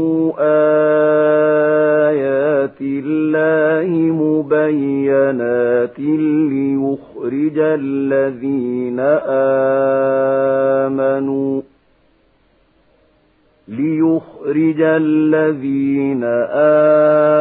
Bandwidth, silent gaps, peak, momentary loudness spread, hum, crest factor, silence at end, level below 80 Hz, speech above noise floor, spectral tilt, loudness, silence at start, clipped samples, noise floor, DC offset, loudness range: 4 kHz; none; -2 dBFS; 7 LU; none; 12 dB; 0 s; -62 dBFS; 42 dB; -13 dB/octave; -15 LUFS; 0 s; under 0.1%; -56 dBFS; under 0.1%; 6 LU